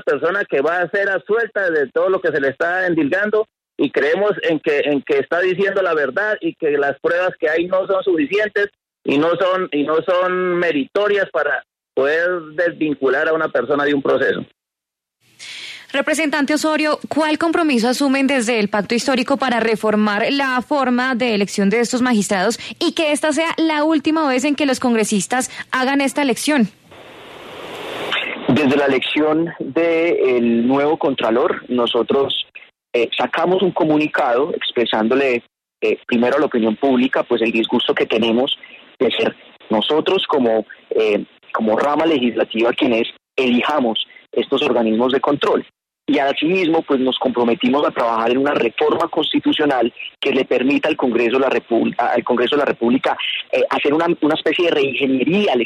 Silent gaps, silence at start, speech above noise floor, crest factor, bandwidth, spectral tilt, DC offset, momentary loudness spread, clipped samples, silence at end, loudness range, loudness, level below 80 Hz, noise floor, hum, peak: none; 0.05 s; 68 dB; 14 dB; 13.5 kHz; -4.5 dB/octave; under 0.1%; 5 LU; under 0.1%; 0 s; 2 LU; -17 LUFS; -62 dBFS; -84 dBFS; none; -4 dBFS